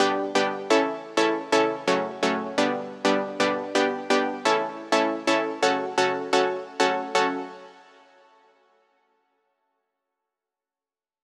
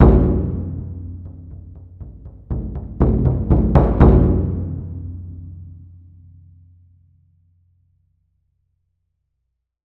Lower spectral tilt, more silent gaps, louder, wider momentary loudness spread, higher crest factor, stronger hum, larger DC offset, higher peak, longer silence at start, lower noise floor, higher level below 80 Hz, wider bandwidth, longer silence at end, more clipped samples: second, -3 dB/octave vs -12 dB/octave; neither; second, -24 LUFS vs -18 LUFS; second, 4 LU vs 26 LU; about the same, 20 dB vs 18 dB; neither; neither; second, -6 dBFS vs -2 dBFS; about the same, 0 s vs 0 s; first, under -90 dBFS vs -75 dBFS; second, under -90 dBFS vs -24 dBFS; first, 13 kHz vs 4 kHz; second, 3.5 s vs 4.15 s; neither